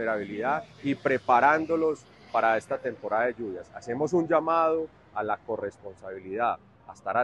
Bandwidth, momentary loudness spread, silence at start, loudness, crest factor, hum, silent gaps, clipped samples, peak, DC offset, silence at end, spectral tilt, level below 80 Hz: 10.5 kHz; 15 LU; 0 s; -27 LUFS; 20 dB; none; none; under 0.1%; -8 dBFS; under 0.1%; 0 s; -6.5 dB/octave; -66 dBFS